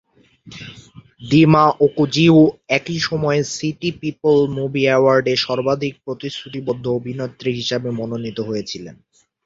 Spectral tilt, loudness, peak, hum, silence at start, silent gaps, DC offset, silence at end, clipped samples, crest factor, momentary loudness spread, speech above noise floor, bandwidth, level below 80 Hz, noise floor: -6 dB/octave; -18 LUFS; -2 dBFS; none; 0.45 s; none; under 0.1%; 0.5 s; under 0.1%; 16 dB; 15 LU; 25 dB; 7.8 kHz; -54 dBFS; -42 dBFS